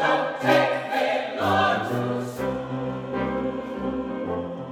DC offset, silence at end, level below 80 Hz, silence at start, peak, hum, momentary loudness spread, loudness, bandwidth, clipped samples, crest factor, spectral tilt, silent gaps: under 0.1%; 0 s; -52 dBFS; 0 s; -6 dBFS; none; 9 LU; -25 LUFS; 18 kHz; under 0.1%; 18 dB; -6 dB/octave; none